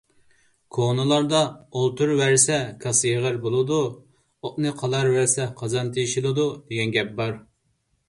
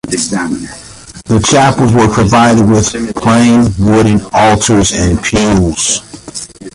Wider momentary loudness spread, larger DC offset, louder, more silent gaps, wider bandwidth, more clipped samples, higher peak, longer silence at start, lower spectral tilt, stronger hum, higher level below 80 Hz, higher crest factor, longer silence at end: second, 9 LU vs 17 LU; neither; second, -22 LUFS vs -9 LUFS; neither; about the same, 11.5 kHz vs 11.5 kHz; neither; about the same, -2 dBFS vs 0 dBFS; first, 0.75 s vs 0.05 s; about the same, -4 dB/octave vs -5 dB/octave; neither; second, -60 dBFS vs -28 dBFS; first, 20 dB vs 10 dB; first, 0.7 s vs 0.05 s